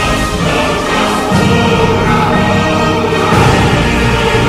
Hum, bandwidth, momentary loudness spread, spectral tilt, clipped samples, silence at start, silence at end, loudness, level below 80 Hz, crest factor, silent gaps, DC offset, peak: none; 16 kHz; 3 LU; -5.5 dB/octave; under 0.1%; 0 s; 0 s; -11 LUFS; -24 dBFS; 10 dB; none; under 0.1%; 0 dBFS